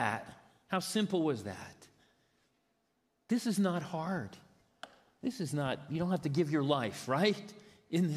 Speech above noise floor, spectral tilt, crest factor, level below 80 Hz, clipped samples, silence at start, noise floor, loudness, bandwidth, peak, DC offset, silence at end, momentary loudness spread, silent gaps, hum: 45 dB; -5.5 dB/octave; 20 dB; -74 dBFS; under 0.1%; 0 s; -78 dBFS; -34 LUFS; 15 kHz; -16 dBFS; under 0.1%; 0 s; 21 LU; none; none